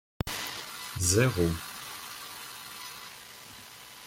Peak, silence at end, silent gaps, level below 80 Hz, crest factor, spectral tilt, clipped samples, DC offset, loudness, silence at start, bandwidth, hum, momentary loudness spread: -10 dBFS; 0 s; none; -54 dBFS; 22 dB; -4 dB/octave; under 0.1%; under 0.1%; -31 LUFS; 0.25 s; 17 kHz; none; 21 LU